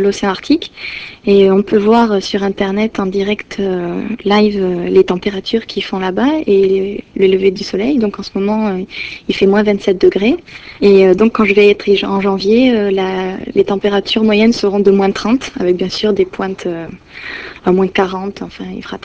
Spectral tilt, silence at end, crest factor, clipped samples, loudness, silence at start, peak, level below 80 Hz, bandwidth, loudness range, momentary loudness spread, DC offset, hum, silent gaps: -6 dB/octave; 0.05 s; 12 dB; 0.1%; -13 LUFS; 0 s; 0 dBFS; -44 dBFS; 8 kHz; 4 LU; 12 LU; under 0.1%; none; none